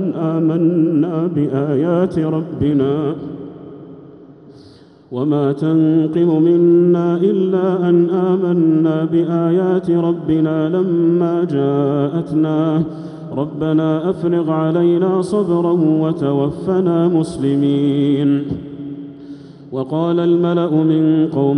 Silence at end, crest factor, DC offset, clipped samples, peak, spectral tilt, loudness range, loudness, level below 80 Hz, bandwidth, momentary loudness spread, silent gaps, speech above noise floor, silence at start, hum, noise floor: 0 s; 12 dB; under 0.1%; under 0.1%; -4 dBFS; -9.5 dB/octave; 5 LU; -16 LUFS; -52 dBFS; 10 kHz; 12 LU; none; 29 dB; 0 s; none; -43 dBFS